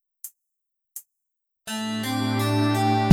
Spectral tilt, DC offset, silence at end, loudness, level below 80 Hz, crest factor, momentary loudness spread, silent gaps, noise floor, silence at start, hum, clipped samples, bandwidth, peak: -5.5 dB/octave; under 0.1%; 0 s; -24 LUFS; -70 dBFS; 24 dB; 20 LU; none; -81 dBFS; 0.25 s; none; under 0.1%; 18.5 kHz; 0 dBFS